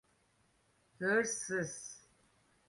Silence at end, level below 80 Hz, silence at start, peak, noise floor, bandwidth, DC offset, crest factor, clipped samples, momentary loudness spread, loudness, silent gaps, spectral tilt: 0.7 s; -78 dBFS; 1 s; -18 dBFS; -73 dBFS; 11.5 kHz; under 0.1%; 22 dB; under 0.1%; 17 LU; -35 LUFS; none; -3.5 dB/octave